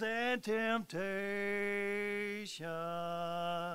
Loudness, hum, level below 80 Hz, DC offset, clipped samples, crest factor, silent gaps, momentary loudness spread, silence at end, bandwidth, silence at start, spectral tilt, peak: -37 LUFS; none; -76 dBFS; 0.1%; under 0.1%; 14 dB; none; 6 LU; 0 s; 16 kHz; 0 s; -4.5 dB/octave; -22 dBFS